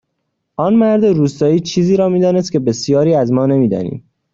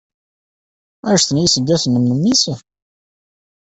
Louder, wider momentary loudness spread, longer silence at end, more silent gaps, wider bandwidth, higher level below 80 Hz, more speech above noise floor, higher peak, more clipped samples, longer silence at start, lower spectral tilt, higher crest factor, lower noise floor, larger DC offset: about the same, -14 LUFS vs -14 LUFS; about the same, 8 LU vs 8 LU; second, 0.35 s vs 1.1 s; neither; second, 7.6 kHz vs 8.4 kHz; about the same, -52 dBFS vs -52 dBFS; second, 58 dB vs over 75 dB; about the same, -2 dBFS vs -2 dBFS; neither; second, 0.6 s vs 1.05 s; first, -7 dB/octave vs -4 dB/octave; about the same, 12 dB vs 16 dB; second, -71 dBFS vs under -90 dBFS; neither